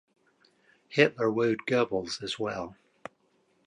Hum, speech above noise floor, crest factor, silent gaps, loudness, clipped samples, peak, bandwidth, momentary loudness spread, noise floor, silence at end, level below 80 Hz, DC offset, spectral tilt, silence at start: none; 42 dB; 24 dB; none; -28 LUFS; under 0.1%; -8 dBFS; 11 kHz; 23 LU; -69 dBFS; 0.95 s; -68 dBFS; under 0.1%; -5 dB/octave; 0.9 s